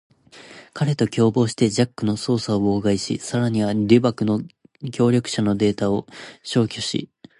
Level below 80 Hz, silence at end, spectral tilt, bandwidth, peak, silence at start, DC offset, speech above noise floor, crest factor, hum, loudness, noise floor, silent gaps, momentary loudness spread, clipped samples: -52 dBFS; 0.35 s; -6 dB/octave; 11.5 kHz; -2 dBFS; 0.35 s; under 0.1%; 25 dB; 20 dB; none; -21 LUFS; -45 dBFS; none; 10 LU; under 0.1%